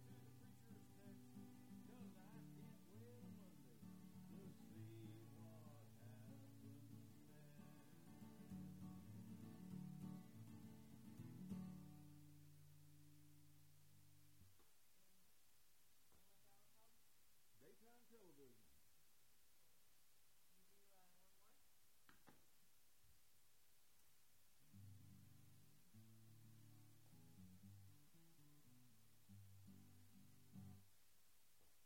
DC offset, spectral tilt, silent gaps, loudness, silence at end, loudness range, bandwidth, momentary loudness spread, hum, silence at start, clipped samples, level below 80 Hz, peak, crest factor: under 0.1%; -6 dB/octave; none; -63 LUFS; 0 s; 10 LU; 16.5 kHz; 11 LU; none; 0 s; under 0.1%; -88 dBFS; -42 dBFS; 22 dB